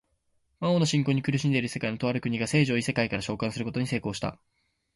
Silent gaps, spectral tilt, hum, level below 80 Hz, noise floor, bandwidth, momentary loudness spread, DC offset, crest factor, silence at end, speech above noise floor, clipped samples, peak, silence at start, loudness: none; -5.5 dB/octave; none; -56 dBFS; -72 dBFS; 11.5 kHz; 7 LU; under 0.1%; 16 dB; 0.6 s; 45 dB; under 0.1%; -12 dBFS; 0.6 s; -27 LUFS